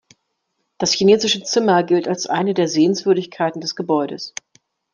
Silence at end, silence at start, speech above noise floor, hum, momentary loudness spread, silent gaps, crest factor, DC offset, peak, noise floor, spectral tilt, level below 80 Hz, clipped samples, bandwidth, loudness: 0.65 s; 0.8 s; 55 dB; none; 11 LU; none; 16 dB; under 0.1%; -2 dBFS; -73 dBFS; -4 dB/octave; -64 dBFS; under 0.1%; 9.8 kHz; -18 LUFS